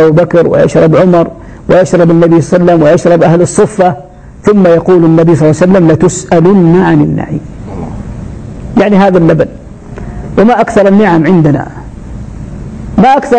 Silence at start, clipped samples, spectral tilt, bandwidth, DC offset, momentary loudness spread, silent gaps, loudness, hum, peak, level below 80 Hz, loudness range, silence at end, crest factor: 0 s; 0.3%; -7.5 dB/octave; 9.2 kHz; under 0.1%; 18 LU; none; -7 LUFS; none; 0 dBFS; -30 dBFS; 4 LU; 0 s; 6 dB